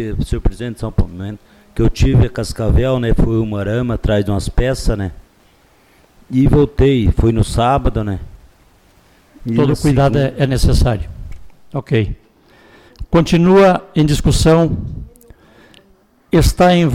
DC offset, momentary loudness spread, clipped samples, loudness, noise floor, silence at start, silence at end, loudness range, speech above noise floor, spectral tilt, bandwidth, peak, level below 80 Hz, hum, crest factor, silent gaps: under 0.1%; 15 LU; under 0.1%; -15 LUFS; -52 dBFS; 0 s; 0 s; 4 LU; 38 dB; -7 dB/octave; 16 kHz; -4 dBFS; -22 dBFS; none; 12 dB; none